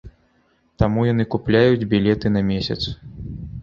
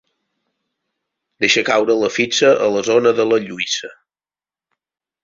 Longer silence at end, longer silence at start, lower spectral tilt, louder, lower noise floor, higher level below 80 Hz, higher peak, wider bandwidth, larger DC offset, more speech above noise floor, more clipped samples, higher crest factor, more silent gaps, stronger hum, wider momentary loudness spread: second, 0 s vs 1.3 s; second, 0.05 s vs 1.4 s; first, -8 dB/octave vs -3 dB/octave; second, -19 LUFS vs -16 LUFS; second, -62 dBFS vs under -90 dBFS; first, -38 dBFS vs -62 dBFS; about the same, -2 dBFS vs -2 dBFS; about the same, 7.2 kHz vs 7.6 kHz; neither; second, 43 dB vs over 74 dB; neither; about the same, 18 dB vs 18 dB; neither; neither; first, 17 LU vs 8 LU